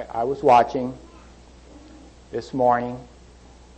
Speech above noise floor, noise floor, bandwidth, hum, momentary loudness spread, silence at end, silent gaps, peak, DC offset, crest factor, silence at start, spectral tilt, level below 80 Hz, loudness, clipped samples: 27 dB; -47 dBFS; 8.6 kHz; 60 Hz at -50 dBFS; 18 LU; 0.75 s; none; -6 dBFS; under 0.1%; 18 dB; 0 s; -6.5 dB/octave; -50 dBFS; -21 LUFS; under 0.1%